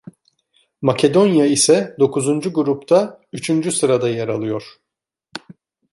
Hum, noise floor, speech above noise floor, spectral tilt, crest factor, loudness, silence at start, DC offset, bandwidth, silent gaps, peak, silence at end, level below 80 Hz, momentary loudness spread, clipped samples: none; -67 dBFS; 50 dB; -4.5 dB/octave; 16 dB; -17 LUFS; 0.8 s; under 0.1%; 11.5 kHz; none; -2 dBFS; 0.55 s; -62 dBFS; 14 LU; under 0.1%